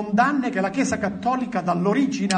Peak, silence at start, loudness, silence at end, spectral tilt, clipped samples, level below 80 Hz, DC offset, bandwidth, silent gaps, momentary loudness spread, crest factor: -6 dBFS; 0 s; -22 LUFS; 0 s; -5.5 dB/octave; under 0.1%; -54 dBFS; under 0.1%; 9.6 kHz; none; 4 LU; 16 dB